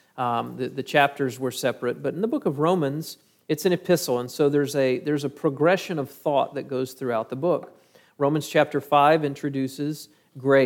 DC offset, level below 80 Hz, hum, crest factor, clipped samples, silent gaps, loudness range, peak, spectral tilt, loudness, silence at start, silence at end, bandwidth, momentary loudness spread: under 0.1%; -76 dBFS; none; 20 dB; under 0.1%; none; 2 LU; -4 dBFS; -5.5 dB/octave; -24 LUFS; 0.15 s; 0 s; 18 kHz; 9 LU